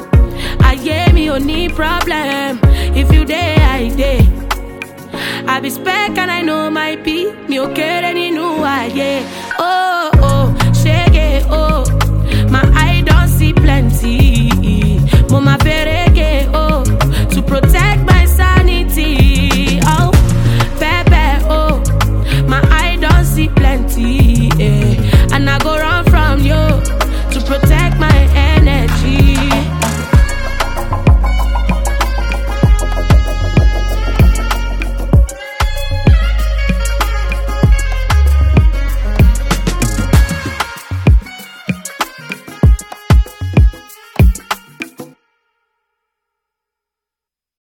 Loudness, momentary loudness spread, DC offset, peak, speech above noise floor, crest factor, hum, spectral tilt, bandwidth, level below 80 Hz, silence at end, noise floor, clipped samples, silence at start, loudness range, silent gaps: -13 LUFS; 8 LU; under 0.1%; 0 dBFS; 74 dB; 10 dB; none; -6 dB/octave; 17.5 kHz; -14 dBFS; 2.55 s; -86 dBFS; under 0.1%; 0 s; 5 LU; none